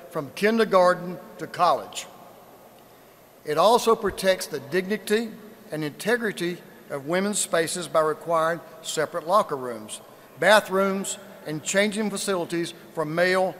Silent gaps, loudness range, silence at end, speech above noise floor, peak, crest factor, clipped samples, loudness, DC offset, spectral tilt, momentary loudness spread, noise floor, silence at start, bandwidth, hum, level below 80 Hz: none; 3 LU; 0 s; 28 dB; -2 dBFS; 22 dB; under 0.1%; -24 LUFS; under 0.1%; -3.5 dB/octave; 17 LU; -52 dBFS; 0 s; 16 kHz; none; -62 dBFS